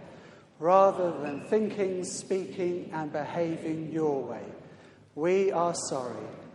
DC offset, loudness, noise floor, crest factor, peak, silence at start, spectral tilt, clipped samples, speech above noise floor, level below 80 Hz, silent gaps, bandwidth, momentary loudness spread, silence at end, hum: under 0.1%; -29 LUFS; -53 dBFS; 22 dB; -8 dBFS; 0 s; -5.5 dB/octave; under 0.1%; 24 dB; -76 dBFS; none; 11.5 kHz; 15 LU; 0 s; none